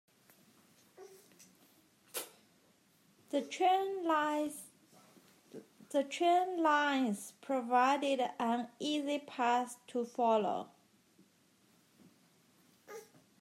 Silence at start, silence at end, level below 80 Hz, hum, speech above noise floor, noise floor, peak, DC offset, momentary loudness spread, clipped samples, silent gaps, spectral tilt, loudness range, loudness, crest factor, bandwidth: 1 s; 0.35 s; under -90 dBFS; none; 36 dB; -70 dBFS; -18 dBFS; under 0.1%; 22 LU; under 0.1%; none; -3.5 dB/octave; 7 LU; -34 LUFS; 20 dB; 16 kHz